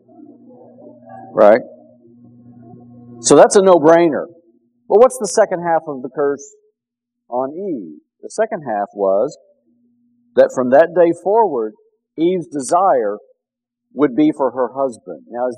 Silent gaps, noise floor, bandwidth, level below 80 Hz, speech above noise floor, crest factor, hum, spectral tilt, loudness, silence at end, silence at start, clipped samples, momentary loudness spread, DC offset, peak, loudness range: none; -81 dBFS; 13.5 kHz; -66 dBFS; 66 dB; 16 dB; none; -4.5 dB/octave; -15 LUFS; 0 s; 1.1 s; 0.2%; 17 LU; under 0.1%; 0 dBFS; 9 LU